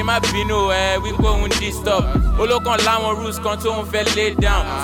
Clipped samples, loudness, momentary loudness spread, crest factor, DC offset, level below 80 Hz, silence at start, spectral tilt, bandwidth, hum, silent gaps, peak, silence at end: under 0.1%; -18 LUFS; 5 LU; 14 dB; under 0.1%; -24 dBFS; 0 s; -4 dB/octave; 18 kHz; none; none; -4 dBFS; 0 s